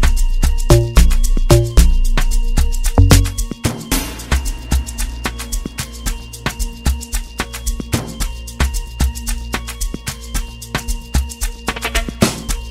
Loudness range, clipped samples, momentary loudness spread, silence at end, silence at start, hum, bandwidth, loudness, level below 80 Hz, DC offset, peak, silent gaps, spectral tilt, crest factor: 8 LU; under 0.1%; 12 LU; 0 s; 0 s; none; 16.5 kHz; -19 LUFS; -16 dBFS; under 0.1%; 0 dBFS; none; -4.5 dB/octave; 16 dB